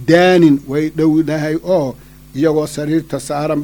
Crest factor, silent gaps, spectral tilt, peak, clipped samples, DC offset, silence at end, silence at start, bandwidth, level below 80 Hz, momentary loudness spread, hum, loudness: 14 dB; none; -6.5 dB/octave; 0 dBFS; under 0.1%; under 0.1%; 0 s; 0 s; over 20 kHz; -44 dBFS; 10 LU; none; -15 LUFS